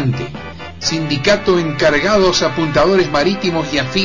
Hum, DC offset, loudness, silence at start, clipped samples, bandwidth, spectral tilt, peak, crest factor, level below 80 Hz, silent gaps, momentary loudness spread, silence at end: none; 0.8%; -15 LUFS; 0 s; under 0.1%; 7.6 kHz; -4.5 dB/octave; -4 dBFS; 12 dB; -38 dBFS; none; 10 LU; 0 s